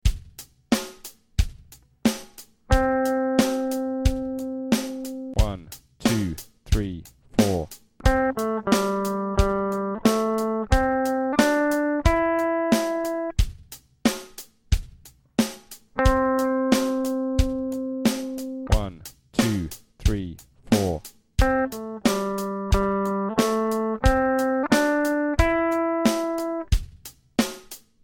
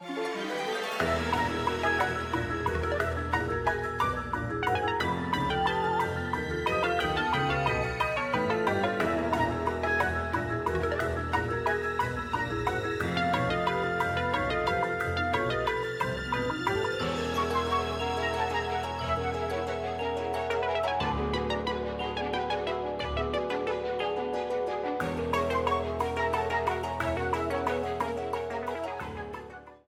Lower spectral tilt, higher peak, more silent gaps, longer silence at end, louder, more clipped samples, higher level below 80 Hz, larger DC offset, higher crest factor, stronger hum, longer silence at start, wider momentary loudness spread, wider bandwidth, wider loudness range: about the same, -5.5 dB/octave vs -5.5 dB/octave; first, -4 dBFS vs -12 dBFS; neither; first, 0.25 s vs 0.1 s; first, -24 LUFS vs -30 LUFS; neither; first, -32 dBFS vs -46 dBFS; neither; about the same, 20 dB vs 18 dB; neither; about the same, 0.05 s vs 0 s; first, 12 LU vs 5 LU; about the same, 17 kHz vs 16.5 kHz; about the same, 4 LU vs 3 LU